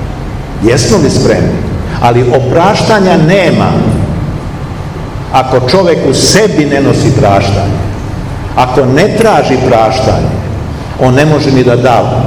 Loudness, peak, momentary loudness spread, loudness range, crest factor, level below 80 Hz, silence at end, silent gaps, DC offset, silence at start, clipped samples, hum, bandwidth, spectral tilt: -8 LUFS; 0 dBFS; 12 LU; 2 LU; 8 dB; -24 dBFS; 0 s; none; 0.8%; 0 s; 4%; none; 17 kHz; -5.5 dB/octave